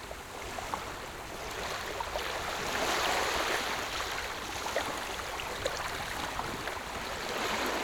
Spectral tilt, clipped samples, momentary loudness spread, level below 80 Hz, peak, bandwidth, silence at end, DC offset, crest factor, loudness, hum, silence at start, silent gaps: -2 dB/octave; under 0.1%; 9 LU; -52 dBFS; -16 dBFS; over 20 kHz; 0 s; under 0.1%; 18 dB; -34 LUFS; none; 0 s; none